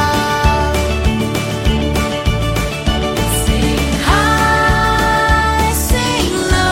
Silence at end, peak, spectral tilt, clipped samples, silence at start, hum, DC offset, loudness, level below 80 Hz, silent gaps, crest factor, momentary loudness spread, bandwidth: 0 s; -2 dBFS; -4.5 dB/octave; under 0.1%; 0 s; none; under 0.1%; -14 LUFS; -20 dBFS; none; 12 dB; 5 LU; 16.5 kHz